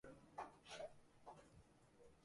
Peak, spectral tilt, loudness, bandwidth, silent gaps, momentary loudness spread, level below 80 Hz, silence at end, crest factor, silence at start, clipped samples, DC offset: -40 dBFS; -3.5 dB/octave; -58 LUFS; 11.5 kHz; none; 10 LU; -78 dBFS; 0 s; 20 dB; 0.05 s; under 0.1%; under 0.1%